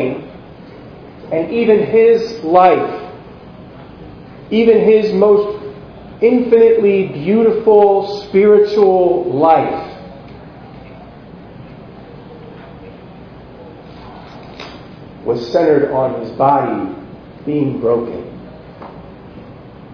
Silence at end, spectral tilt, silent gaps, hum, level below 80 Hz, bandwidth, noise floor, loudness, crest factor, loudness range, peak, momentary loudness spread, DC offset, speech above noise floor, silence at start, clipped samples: 0 s; -8 dB/octave; none; none; -48 dBFS; 5.4 kHz; -36 dBFS; -13 LUFS; 16 dB; 20 LU; 0 dBFS; 26 LU; under 0.1%; 24 dB; 0 s; under 0.1%